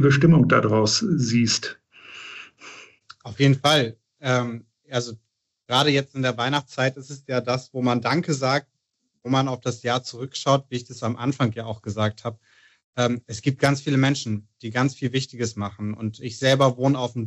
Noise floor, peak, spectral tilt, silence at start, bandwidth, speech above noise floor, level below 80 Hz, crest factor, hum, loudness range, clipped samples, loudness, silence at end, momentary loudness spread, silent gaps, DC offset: -75 dBFS; -4 dBFS; -5 dB/octave; 0 s; 12 kHz; 53 dB; -62 dBFS; 18 dB; none; 3 LU; under 0.1%; -23 LUFS; 0 s; 17 LU; 12.84-12.93 s; under 0.1%